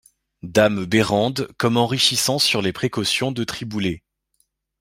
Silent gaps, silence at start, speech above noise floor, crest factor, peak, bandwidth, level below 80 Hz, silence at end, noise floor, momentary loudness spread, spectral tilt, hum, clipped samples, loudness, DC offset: none; 0.45 s; 48 dB; 20 dB; 0 dBFS; 16.5 kHz; -54 dBFS; 0.8 s; -68 dBFS; 10 LU; -4 dB/octave; none; under 0.1%; -20 LUFS; under 0.1%